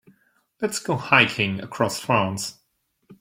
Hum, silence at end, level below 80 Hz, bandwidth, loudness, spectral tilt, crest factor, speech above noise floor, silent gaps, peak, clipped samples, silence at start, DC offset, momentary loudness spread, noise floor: none; 0.05 s; -62 dBFS; 16.5 kHz; -22 LUFS; -4 dB/octave; 24 dB; 47 dB; none; 0 dBFS; under 0.1%; 0.6 s; under 0.1%; 13 LU; -70 dBFS